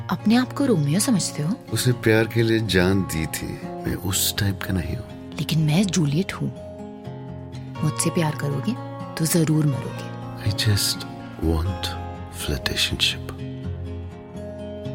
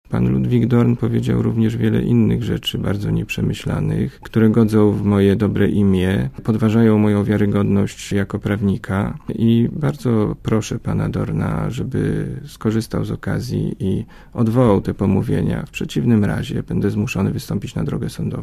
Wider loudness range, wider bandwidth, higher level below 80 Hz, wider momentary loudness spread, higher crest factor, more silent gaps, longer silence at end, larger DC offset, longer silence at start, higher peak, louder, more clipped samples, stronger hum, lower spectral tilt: about the same, 4 LU vs 5 LU; about the same, 16.5 kHz vs 15 kHz; second, -44 dBFS vs -36 dBFS; first, 15 LU vs 8 LU; about the same, 20 dB vs 16 dB; neither; about the same, 0 s vs 0 s; neither; about the same, 0 s vs 0.1 s; about the same, -4 dBFS vs -2 dBFS; second, -23 LUFS vs -19 LUFS; neither; neither; second, -4.5 dB/octave vs -7.5 dB/octave